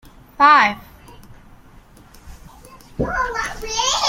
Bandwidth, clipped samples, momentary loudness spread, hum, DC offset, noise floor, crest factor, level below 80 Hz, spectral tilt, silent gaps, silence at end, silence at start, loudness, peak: 16.5 kHz; under 0.1%; 18 LU; none; under 0.1%; -46 dBFS; 20 dB; -40 dBFS; -2 dB/octave; none; 0 s; 0.4 s; -17 LUFS; -2 dBFS